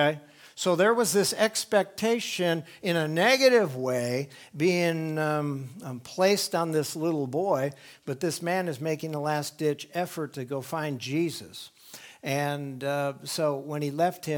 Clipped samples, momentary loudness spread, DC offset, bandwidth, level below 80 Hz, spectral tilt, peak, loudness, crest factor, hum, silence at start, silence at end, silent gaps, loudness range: under 0.1%; 14 LU; under 0.1%; 19.5 kHz; -76 dBFS; -4.5 dB/octave; -8 dBFS; -27 LUFS; 20 dB; none; 0 s; 0 s; none; 7 LU